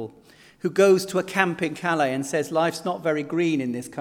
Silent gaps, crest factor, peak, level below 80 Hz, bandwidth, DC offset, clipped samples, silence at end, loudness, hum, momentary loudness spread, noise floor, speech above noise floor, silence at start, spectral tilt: none; 22 dB; -2 dBFS; -70 dBFS; 17 kHz; under 0.1%; under 0.1%; 0 s; -23 LUFS; none; 9 LU; -52 dBFS; 29 dB; 0 s; -5 dB/octave